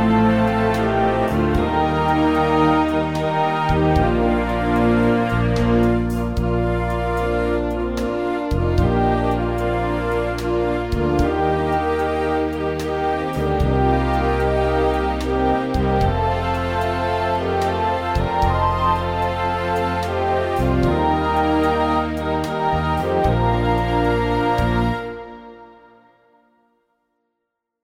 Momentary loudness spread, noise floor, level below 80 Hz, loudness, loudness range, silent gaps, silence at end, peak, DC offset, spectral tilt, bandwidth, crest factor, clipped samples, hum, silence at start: 5 LU; -78 dBFS; -30 dBFS; -19 LUFS; 3 LU; none; 2.1 s; -4 dBFS; 0.2%; -7.5 dB/octave; 16.5 kHz; 14 dB; under 0.1%; none; 0 s